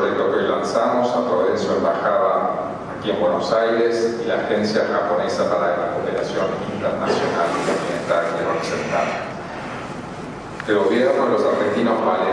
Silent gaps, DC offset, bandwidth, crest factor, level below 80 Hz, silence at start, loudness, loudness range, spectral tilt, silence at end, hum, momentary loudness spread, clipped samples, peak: none; under 0.1%; 10.5 kHz; 16 dB; -54 dBFS; 0 s; -20 LUFS; 3 LU; -5.5 dB/octave; 0 s; none; 10 LU; under 0.1%; -4 dBFS